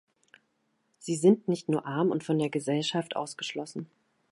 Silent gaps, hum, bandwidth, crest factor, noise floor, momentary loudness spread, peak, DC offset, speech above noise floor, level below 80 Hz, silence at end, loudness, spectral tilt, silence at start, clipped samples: none; none; 11.5 kHz; 20 dB; -75 dBFS; 16 LU; -10 dBFS; under 0.1%; 46 dB; -78 dBFS; 0.45 s; -29 LUFS; -5.5 dB/octave; 1 s; under 0.1%